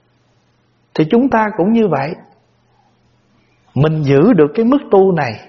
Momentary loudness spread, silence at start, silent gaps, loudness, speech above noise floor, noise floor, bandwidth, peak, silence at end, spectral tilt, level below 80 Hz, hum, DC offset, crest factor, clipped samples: 13 LU; 0.95 s; none; -13 LUFS; 45 dB; -57 dBFS; 6.2 kHz; 0 dBFS; 0.1 s; -7 dB/octave; -50 dBFS; none; under 0.1%; 14 dB; under 0.1%